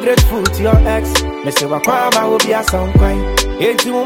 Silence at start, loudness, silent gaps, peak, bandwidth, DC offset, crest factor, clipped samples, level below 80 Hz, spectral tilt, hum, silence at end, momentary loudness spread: 0 s; -14 LUFS; none; 0 dBFS; 18.5 kHz; under 0.1%; 12 dB; under 0.1%; -18 dBFS; -4.5 dB/octave; none; 0 s; 4 LU